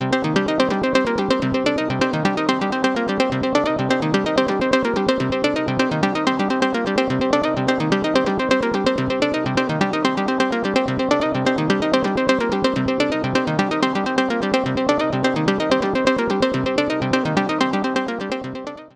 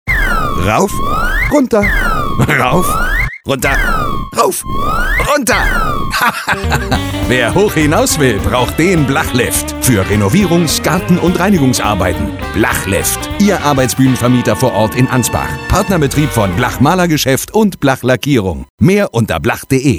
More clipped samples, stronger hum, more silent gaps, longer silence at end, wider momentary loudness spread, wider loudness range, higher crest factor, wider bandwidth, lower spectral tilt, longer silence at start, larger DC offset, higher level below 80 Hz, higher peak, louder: neither; neither; second, none vs 18.70-18.78 s; about the same, 0.05 s vs 0 s; second, 2 LU vs 5 LU; about the same, 0 LU vs 2 LU; first, 18 dB vs 12 dB; second, 11 kHz vs over 20 kHz; about the same, -5.5 dB/octave vs -5 dB/octave; about the same, 0 s vs 0.05 s; neither; second, -48 dBFS vs -22 dBFS; about the same, -2 dBFS vs 0 dBFS; second, -20 LUFS vs -12 LUFS